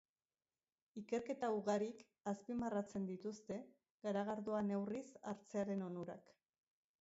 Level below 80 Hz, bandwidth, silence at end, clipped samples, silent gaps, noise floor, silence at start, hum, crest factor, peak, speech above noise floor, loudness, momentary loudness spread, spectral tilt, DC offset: -80 dBFS; 7.6 kHz; 0.8 s; under 0.1%; 3.90-3.98 s; under -90 dBFS; 0.95 s; none; 16 dB; -28 dBFS; over 46 dB; -44 LUFS; 10 LU; -6.5 dB/octave; under 0.1%